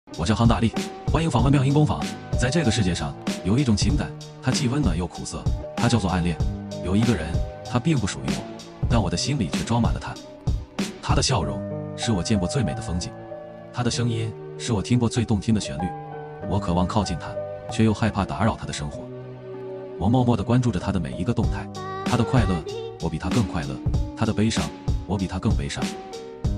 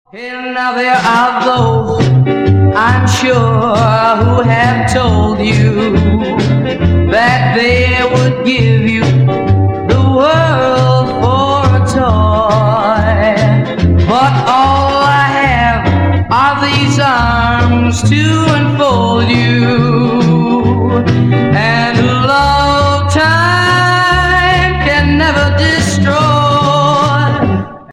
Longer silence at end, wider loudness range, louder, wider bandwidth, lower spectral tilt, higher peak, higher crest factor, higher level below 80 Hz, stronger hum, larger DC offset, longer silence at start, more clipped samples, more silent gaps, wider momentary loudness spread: about the same, 0 s vs 0 s; about the same, 3 LU vs 1 LU; second, -24 LUFS vs -10 LUFS; first, 12.5 kHz vs 11 kHz; about the same, -6 dB/octave vs -6 dB/octave; second, -4 dBFS vs 0 dBFS; first, 18 dB vs 10 dB; second, -34 dBFS vs -28 dBFS; neither; second, under 0.1% vs 0.1%; about the same, 0.05 s vs 0.15 s; neither; neither; first, 11 LU vs 3 LU